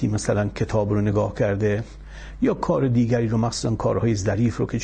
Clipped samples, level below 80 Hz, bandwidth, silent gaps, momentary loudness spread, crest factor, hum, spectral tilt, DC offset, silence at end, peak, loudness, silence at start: under 0.1%; -40 dBFS; 9.4 kHz; none; 4 LU; 14 dB; none; -7 dB/octave; under 0.1%; 0 s; -8 dBFS; -22 LUFS; 0 s